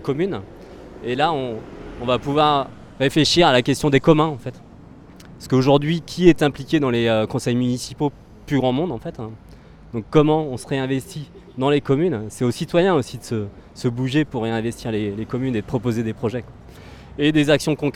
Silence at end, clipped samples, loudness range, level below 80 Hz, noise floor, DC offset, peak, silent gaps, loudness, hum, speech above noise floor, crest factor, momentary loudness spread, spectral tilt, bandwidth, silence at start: 0 s; under 0.1%; 5 LU; -44 dBFS; -43 dBFS; under 0.1%; 0 dBFS; none; -20 LUFS; none; 23 dB; 20 dB; 16 LU; -6 dB/octave; 15.5 kHz; 0 s